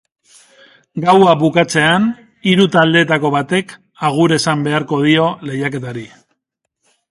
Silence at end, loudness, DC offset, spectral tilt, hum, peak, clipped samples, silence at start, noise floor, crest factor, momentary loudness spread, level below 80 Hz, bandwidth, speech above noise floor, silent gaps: 1.05 s; -14 LUFS; under 0.1%; -5.5 dB/octave; none; 0 dBFS; under 0.1%; 0.95 s; -74 dBFS; 16 dB; 10 LU; -56 dBFS; 11.5 kHz; 61 dB; none